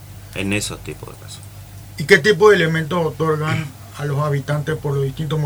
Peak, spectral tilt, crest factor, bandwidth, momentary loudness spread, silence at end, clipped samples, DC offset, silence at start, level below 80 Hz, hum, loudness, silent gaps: 0 dBFS; -5.5 dB/octave; 18 dB; over 20 kHz; 23 LU; 0 s; under 0.1%; under 0.1%; 0 s; -46 dBFS; none; -18 LUFS; none